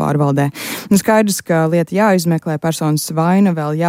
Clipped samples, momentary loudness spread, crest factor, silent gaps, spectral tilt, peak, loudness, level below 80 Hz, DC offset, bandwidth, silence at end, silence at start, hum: under 0.1%; 5 LU; 12 dB; none; -6 dB/octave; -2 dBFS; -15 LUFS; -54 dBFS; under 0.1%; 16.5 kHz; 0 s; 0 s; none